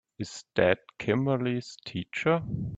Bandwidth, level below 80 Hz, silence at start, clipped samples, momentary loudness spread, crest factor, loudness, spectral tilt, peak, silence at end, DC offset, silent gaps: 8.6 kHz; -58 dBFS; 0.2 s; under 0.1%; 12 LU; 20 dB; -29 LUFS; -6.5 dB/octave; -8 dBFS; 0 s; under 0.1%; none